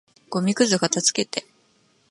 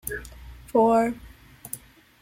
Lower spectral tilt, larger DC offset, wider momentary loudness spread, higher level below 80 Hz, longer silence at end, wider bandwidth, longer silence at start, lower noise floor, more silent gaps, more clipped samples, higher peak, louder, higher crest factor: second, -3 dB/octave vs -5.5 dB/octave; neither; second, 11 LU vs 25 LU; second, -70 dBFS vs -48 dBFS; first, 0.7 s vs 0.45 s; second, 11.5 kHz vs 16.5 kHz; first, 0.3 s vs 0.05 s; first, -62 dBFS vs -43 dBFS; neither; neither; first, -4 dBFS vs -8 dBFS; about the same, -22 LUFS vs -23 LUFS; about the same, 20 dB vs 18 dB